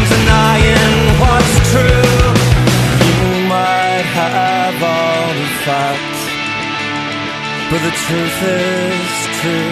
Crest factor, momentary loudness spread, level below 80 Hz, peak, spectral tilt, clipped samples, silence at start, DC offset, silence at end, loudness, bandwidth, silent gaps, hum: 12 dB; 8 LU; -22 dBFS; 0 dBFS; -5 dB/octave; under 0.1%; 0 s; under 0.1%; 0 s; -13 LUFS; 14 kHz; none; none